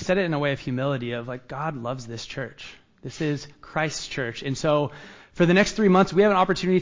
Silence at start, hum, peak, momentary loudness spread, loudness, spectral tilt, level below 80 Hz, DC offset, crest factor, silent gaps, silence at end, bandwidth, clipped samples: 0 s; none; -8 dBFS; 16 LU; -24 LUFS; -6 dB/octave; -52 dBFS; under 0.1%; 16 dB; none; 0 s; 7.6 kHz; under 0.1%